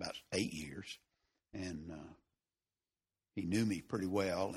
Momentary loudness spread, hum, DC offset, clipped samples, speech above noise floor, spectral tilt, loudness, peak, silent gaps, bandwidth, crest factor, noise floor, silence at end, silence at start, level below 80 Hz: 17 LU; none; under 0.1%; under 0.1%; over 53 dB; -5 dB/octave; -40 LUFS; -22 dBFS; none; 15 kHz; 20 dB; under -90 dBFS; 0 s; 0 s; -68 dBFS